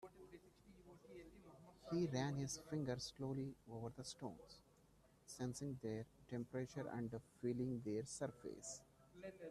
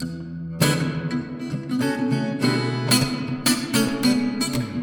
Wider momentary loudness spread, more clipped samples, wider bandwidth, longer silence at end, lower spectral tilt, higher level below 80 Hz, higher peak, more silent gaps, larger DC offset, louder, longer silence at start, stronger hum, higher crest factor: first, 20 LU vs 10 LU; neither; second, 13.5 kHz vs 19 kHz; about the same, 0 s vs 0 s; about the same, -5.5 dB/octave vs -4.5 dB/octave; second, -74 dBFS vs -52 dBFS; second, -30 dBFS vs -4 dBFS; neither; neither; second, -48 LUFS vs -22 LUFS; about the same, 0 s vs 0 s; neither; about the same, 18 dB vs 18 dB